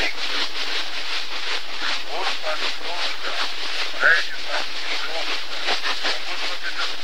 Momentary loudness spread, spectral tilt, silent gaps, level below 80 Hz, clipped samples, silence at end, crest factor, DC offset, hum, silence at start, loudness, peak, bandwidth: 6 LU; -1 dB/octave; none; -58 dBFS; under 0.1%; 0 s; 22 dB; 9%; none; 0 s; -24 LUFS; -2 dBFS; 16 kHz